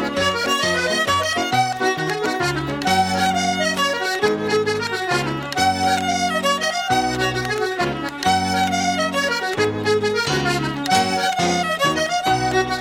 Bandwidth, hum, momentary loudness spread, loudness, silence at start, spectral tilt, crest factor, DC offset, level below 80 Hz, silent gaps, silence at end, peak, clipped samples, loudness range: 16.5 kHz; none; 3 LU; -19 LUFS; 0 s; -3.5 dB/octave; 16 dB; under 0.1%; -48 dBFS; none; 0 s; -4 dBFS; under 0.1%; 1 LU